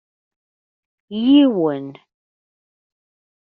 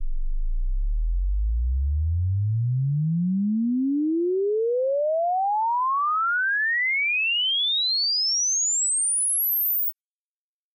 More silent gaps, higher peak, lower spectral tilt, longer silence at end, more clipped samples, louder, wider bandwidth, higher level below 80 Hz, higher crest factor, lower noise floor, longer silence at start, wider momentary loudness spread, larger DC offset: neither; first, -4 dBFS vs -18 dBFS; first, -5 dB/octave vs -3 dB/octave; first, 1.55 s vs 0.8 s; neither; first, -16 LUFS vs -22 LUFS; second, 4.5 kHz vs 11 kHz; second, -66 dBFS vs -30 dBFS; first, 18 dB vs 4 dB; about the same, under -90 dBFS vs under -90 dBFS; first, 1.1 s vs 0 s; first, 17 LU vs 9 LU; neither